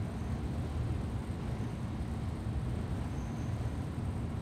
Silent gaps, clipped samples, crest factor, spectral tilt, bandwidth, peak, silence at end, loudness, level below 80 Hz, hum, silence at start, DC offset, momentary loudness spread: none; under 0.1%; 12 dB; -7.5 dB/octave; 13.5 kHz; -24 dBFS; 0 s; -38 LUFS; -44 dBFS; none; 0 s; under 0.1%; 2 LU